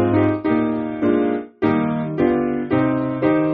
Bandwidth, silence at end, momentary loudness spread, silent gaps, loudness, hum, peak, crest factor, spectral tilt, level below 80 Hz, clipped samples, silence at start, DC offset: 4.5 kHz; 0 s; 3 LU; none; -20 LUFS; none; -4 dBFS; 14 dB; -7.5 dB/octave; -50 dBFS; under 0.1%; 0 s; under 0.1%